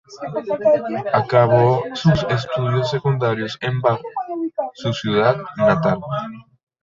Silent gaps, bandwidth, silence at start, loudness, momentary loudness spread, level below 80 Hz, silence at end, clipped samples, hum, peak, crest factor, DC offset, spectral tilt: none; 7.6 kHz; 0.1 s; -19 LUFS; 10 LU; -50 dBFS; 0.4 s; under 0.1%; none; -2 dBFS; 18 dB; under 0.1%; -7 dB/octave